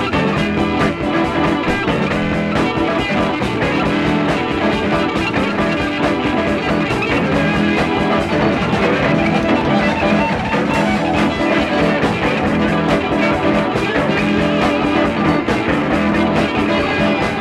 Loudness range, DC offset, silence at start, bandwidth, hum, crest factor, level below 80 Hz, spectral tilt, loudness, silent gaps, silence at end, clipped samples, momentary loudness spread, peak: 1 LU; under 0.1%; 0 s; 12.5 kHz; none; 14 dB; -34 dBFS; -6.5 dB/octave; -16 LUFS; none; 0 s; under 0.1%; 2 LU; -2 dBFS